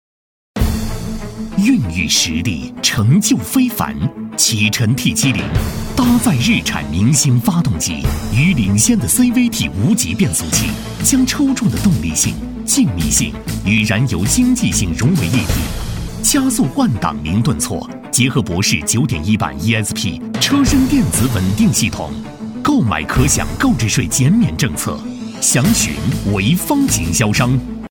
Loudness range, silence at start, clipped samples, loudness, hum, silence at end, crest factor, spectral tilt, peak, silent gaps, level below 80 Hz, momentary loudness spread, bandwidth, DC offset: 2 LU; 0.55 s; under 0.1%; -15 LUFS; none; 0.05 s; 14 dB; -4 dB/octave; 0 dBFS; none; -30 dBFS; 8 LU; 19 kHz; under 0.1%